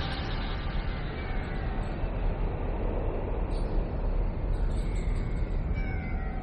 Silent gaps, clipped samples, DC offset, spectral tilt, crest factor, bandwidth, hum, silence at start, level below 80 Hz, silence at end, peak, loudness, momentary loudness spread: none; under 0.1%; under 0.1%; -7.5 dB/octave; 12 dB; 8.6 kHz; none; 0 s; -30 dBFS; 0 s; -16 dBFS; -34 LUFS; 2 LU